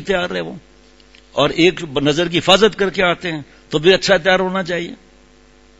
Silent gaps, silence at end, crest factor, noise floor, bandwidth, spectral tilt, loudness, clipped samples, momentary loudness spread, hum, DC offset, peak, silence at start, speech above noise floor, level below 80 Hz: none; 0.85 s; 18 dB; -48 dBFS; 11 kHz; -4.5 dB/octave; -16 LUFS; under 0.1%; 13 LU; none; 0.1%; 0 dBFS; 0 s; 32 dB; -44 dBFS